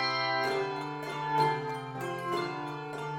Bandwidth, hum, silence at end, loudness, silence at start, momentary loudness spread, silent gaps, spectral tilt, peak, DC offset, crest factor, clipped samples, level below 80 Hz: 17 kHz; none; 0 s; -32 LUFS; 0 s; 9 LU; none; -5 dB/octave; -14 dBFS; under 0.1%; 18 dB; under 0.1%; -70 dBFS